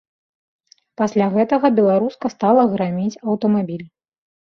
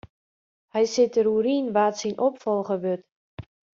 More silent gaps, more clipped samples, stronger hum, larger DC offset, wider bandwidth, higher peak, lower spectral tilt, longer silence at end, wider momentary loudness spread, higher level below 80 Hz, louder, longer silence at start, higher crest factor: second, none vs 3.12-3.37 s; neither; neither; neither; second, 6.8 kHz vs 7.6 kHz; first, -2 dBFS vs -10 dBFS; first, -8 dB/octave vs -5 dB/octave; first, 0.65 s vs 0.4 s; second, 8 LU vs 14 LU; about the same, -64 dBFS vs -64 dBFS; first, -18 LUFS vs -24 LUFS; first, 1 s vs 0.75 s; about the same, 16 dB vs 16 dB